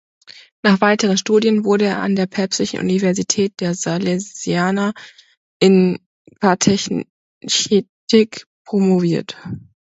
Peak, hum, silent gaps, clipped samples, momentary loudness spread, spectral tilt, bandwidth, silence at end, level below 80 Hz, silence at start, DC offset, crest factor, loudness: 0 dBFS; none; 5.37-5.60 s, 6.06-6.25 s, 7.10-7.41 s, 7.89-8.07 s, 8.46-8.65 s; under 0.1%; 10 LU; -4.5 dB/octave; 8.2 kHz; 0.2 s; -56 dBFS; 0.65 s; under 0.1%; 18 dB; -17 LUFS